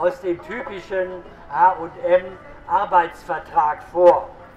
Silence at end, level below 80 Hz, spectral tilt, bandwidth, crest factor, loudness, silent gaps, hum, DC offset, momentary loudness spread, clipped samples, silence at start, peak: 0.1 s; -50 dBFS; -6.5 dB/octave; 8 kHz; 18 dB; -20 LUFS; none; none; under 0.1%; 15 LU; under 0.1%; 0 s; -2 dBFS